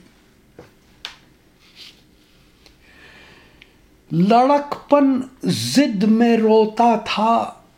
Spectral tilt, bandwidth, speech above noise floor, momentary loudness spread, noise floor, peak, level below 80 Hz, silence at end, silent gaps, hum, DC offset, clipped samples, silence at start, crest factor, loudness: -6 dB/octave; 16 kHz; 37 dB; 12 LU; -53 dBFS; -2 dBFS; -58 dBFS; 0.25 s; none; none; under 0.1%; under 0.1%; 0.6 s; 18 dB; -17 LUFS